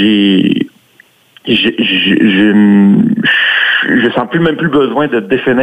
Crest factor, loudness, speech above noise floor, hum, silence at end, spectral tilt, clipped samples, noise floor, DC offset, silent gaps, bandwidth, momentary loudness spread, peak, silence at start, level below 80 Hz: 10 dB; -10 LUFS; 38 dB; none; 0 s; -7 dB/octave; under 0.1%; -47 dBFS; under 0.1%; none; 8.2 kHz; 6 LU; 0 dBFS; 0 s; -50 dBFS